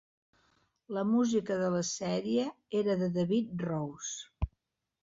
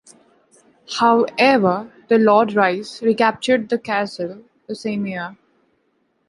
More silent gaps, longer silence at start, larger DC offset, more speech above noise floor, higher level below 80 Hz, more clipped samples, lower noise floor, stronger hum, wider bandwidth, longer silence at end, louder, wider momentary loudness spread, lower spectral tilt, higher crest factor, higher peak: neither; about the same, 0.9 s vs 0.9 s; neither; about the same, 50 dB vs 48 dB; first, -50 dBFS vs -64 dBFS; neither; first, -82 dBFS vs -66 dBFS; neither; second, 7.8 kHz vs 11.5 kHz; second, 0.55 s vs 0.95 s; second, -32 LUFS vs -18 LUFS; second, 11 LU vs 15 LU; about the same, -5.5 dB/octave vs -5.5 dB/octave; about the same, 14 dB vs 18 dB; second, -18 dBFS vs -2 dBFS